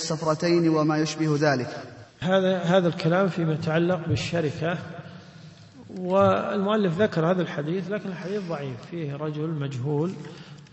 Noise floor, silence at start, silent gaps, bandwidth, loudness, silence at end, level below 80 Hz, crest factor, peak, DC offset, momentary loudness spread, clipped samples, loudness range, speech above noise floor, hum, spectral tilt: -46 dBFS; 0 s; none; 8.4 kHz; -25 LUFS; 0.05 s; -60 dBFS; 18 dB; -8 dBFS; under 0.1%; 14 LU; under 0.1%; 4 LU; 22 dB; none; -6.5 dB/octave